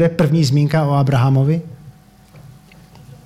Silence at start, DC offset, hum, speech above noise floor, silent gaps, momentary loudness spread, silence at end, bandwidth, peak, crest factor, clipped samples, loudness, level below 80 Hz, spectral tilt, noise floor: 0 s; under 0.1%; none; 30 dB; none; 6 LU; 0.1 s; 13 kHz; -4 dBFS; 12 dB; under 0.1%; -15 LUFS; -48 dBFS; -7.5 dB/octave; -44 dBFS